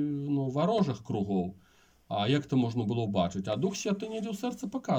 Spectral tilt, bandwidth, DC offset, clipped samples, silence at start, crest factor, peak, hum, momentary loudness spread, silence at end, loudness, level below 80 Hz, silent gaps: -6.5 dB/octave; 16 kHz; under 0.1%; under 0.1%; 0 s; 16 dB; -14 dBFS; none; 7 LU; 0 s; -31 LUFS; -66 dBFS; none